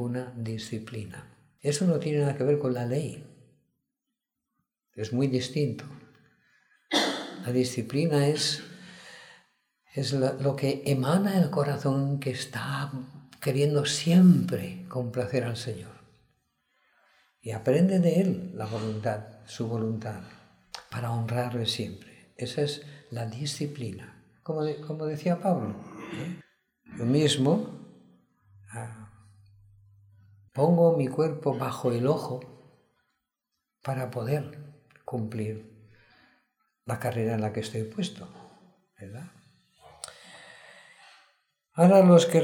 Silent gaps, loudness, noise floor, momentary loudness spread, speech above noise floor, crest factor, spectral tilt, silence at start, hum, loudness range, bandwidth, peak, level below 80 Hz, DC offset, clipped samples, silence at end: none; -27 LUFS; -86 dBFS; 21 LU; 59 dB; 22 dB; -6 dB/octave; 0 s; none; 10 LU; 16.5 kHz; -6 dBFS; -68 dBFS; under 0.1%; under 0.1%; 0 s